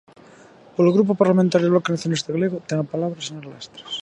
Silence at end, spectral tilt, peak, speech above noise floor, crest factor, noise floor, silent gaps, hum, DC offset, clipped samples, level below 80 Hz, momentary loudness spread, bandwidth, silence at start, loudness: 0 s; -6.5 dB/octave; -2 dBFS; 27 dB; 20 dB; -48 dBFS; none; none; under 0.1%; under 0.1%; -64 dBFS; 15 LU; 10 kHz; 0.8 s; -20 LUFS